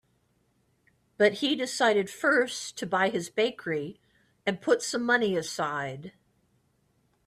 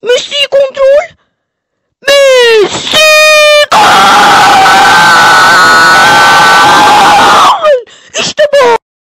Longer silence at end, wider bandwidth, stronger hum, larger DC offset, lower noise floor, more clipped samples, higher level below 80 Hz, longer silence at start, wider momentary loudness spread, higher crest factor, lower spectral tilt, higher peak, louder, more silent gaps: first, 1.2 s vs 0.35 s; second, 14.5 kHz vs 16.5 kHz; neither; neither; first, -70 dBFS vs -66 dBFS; second, under 0.1% vs 0.5%; second, -72 dBFS vs -40 dBFS; first, 1.2 s vs 0.05 s; about the same, 9 LU vs 7 LU; first, 20 dB vs 4 dB; first, -3.5 dB/octave vs -1.5 dB/octave; second, -8 dBFS vs 0 dBFS; second, -27 LUFS vs -3 LUFS; neither